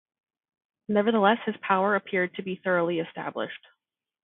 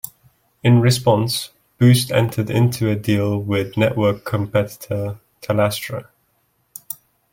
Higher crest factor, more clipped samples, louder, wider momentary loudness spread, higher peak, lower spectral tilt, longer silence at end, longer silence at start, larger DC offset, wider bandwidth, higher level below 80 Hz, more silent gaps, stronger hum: about the same, 22 dB vs 18 dB; neither; second, -26 LUFS vs -19 LUFS; second, 12 LU vs 18 LU; second, -6 dBFS vs -2 dBFS; first, -10 dB/octave vs -6 dB/octave; first, 0.65 s vs 0.4 s; first, 0.9 s vs 0.65 s; neither; second, 4 kHz vs 17 kHz; second, -74 dBFS vs -54 dBFS; neither; neither